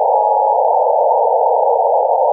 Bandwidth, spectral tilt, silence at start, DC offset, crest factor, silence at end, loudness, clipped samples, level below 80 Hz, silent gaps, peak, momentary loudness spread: 1.1 kHz; -7 dB/octave; 0 s; under 0.1%; 10 dB; 0 s; -13 LUFS; under 0.1%; under -90 dBFS; none; -4 dBFS; 0 LU